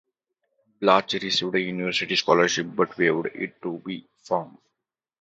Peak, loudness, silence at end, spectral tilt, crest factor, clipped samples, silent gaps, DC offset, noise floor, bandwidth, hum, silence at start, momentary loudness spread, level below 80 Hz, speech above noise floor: -2 dBFS; -24 LUFS; 0.7 s; -3.5 dB/octave; 24 dB; under 0.1%; none; under 0.1%; -84 dBFS; 8 kHz; none; 0.8 s; 13 LU; -70 dBFS; 60 dB